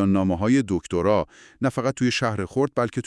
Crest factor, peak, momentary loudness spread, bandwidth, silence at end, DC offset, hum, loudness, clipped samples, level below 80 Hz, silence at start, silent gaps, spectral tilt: 14 dB; -8 dBFS; 5 LU; 12 kHz; 0.05 s; under 0.1%; none; -23 LUFS; under 0.1%; -54 dBFS; 0 s; none; -6 dB/octave